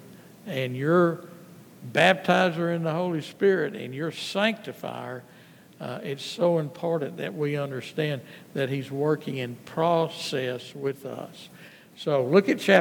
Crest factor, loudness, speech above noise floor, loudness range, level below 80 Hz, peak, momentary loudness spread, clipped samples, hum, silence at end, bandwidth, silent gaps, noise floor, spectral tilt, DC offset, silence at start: 22 dB; -26 LUFS; 22 dB; 5 LU; -78 dBFS; -4 dBFS; 16 LU; under 0.1%; none; 0 s; 19.5 kHz; none; -48 dBFS; -6 dB/octave; under 0.1%; 0 s